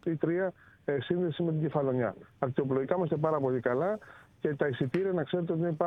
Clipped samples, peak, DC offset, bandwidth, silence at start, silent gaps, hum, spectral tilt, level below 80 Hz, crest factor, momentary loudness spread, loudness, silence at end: under 0.1%; -12 dBFS; under 0.1%; 5.8 kHz; 0.05 s; none; none; -9.5 dB/octave; -68 dBFS; 18 dB; 6 LU; -31 LUFS; 0 s